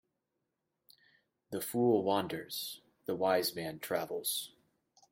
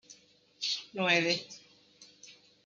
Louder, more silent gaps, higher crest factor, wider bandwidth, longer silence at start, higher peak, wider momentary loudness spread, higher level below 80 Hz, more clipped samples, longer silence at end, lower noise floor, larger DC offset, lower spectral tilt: second, -34 LUFS vs -30 LUFS; neither; about the same, 20 dB vs 22 dB; first, 16.5 kHz vs 7.6 kHz; first, 1.5 s vs 0.1 s; second, -18 dBFS vs -12 dBFS; second, 13 LU vs 25 LU; about the same, -78 dBFS vs -82 dBFS; neither; first, 0.65 s vs 0.35 s; first, -85 dBFS vs -61 dBFS; neither; about the same, -4 dB/octave vs -3 dB/octave